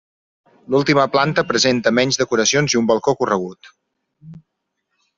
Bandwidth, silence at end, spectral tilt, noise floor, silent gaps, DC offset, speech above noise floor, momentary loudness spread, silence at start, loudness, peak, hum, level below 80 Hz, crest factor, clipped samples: 7.8 kHz; 0.8 s; -3.5 dB/octave; -75 dBFS; none; under 0.1%; 58 dB; 5 LU; 0.7 s; -17 LUFS; -2 dBFS; none; -56 dBFS; 16 dB; under 0.1%